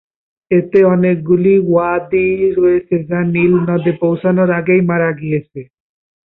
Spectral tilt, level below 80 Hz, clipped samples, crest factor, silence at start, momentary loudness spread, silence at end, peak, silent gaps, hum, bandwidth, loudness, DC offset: -12 dB/octave; -50 dBFS; under 0.1%; 12 dB; 0.5 s; 6 LU; 0.7 s; -2 dBFS; none; none; 4 kHz; -14 LUFS; under 0.1%